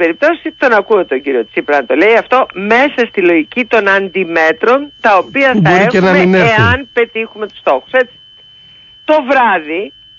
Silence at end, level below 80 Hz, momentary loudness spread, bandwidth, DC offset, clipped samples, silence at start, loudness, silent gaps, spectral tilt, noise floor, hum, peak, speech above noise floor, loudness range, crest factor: 0.3 s; -44 dBFS; 7 LU; 7.2 kHz; under 0.1%; under 0.1%; 0 s; -11 LUFS; none; -6.5 dB/octave; -40 dBFS; none; 0 dBFS; 29 dB; 4 LU; 12 dB